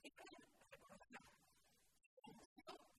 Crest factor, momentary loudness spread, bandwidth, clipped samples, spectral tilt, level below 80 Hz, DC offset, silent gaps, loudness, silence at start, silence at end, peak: 24 dB; 6 LU; 13 kHz; under 0.1%; -3 dB/octave; -86 dBFS; under 0.1%; 2.06-2.17 s, 2.45-2.56 s; -64 LUFS; 0 s; 0 s; -42 dBFS